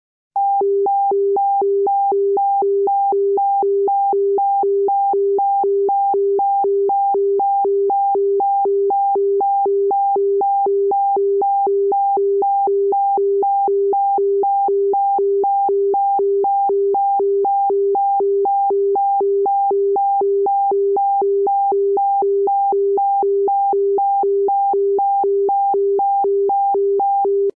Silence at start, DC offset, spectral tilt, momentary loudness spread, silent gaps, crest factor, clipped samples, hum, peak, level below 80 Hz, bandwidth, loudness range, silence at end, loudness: 0.35 s; 0.1%; -11 dB/octave; 0 LU; none; 4 dB; under 0.1%; none; -12 dBFS; -80 dBFS; 1.4 kHz; 0 LU; 0.05 s; -17 LUFS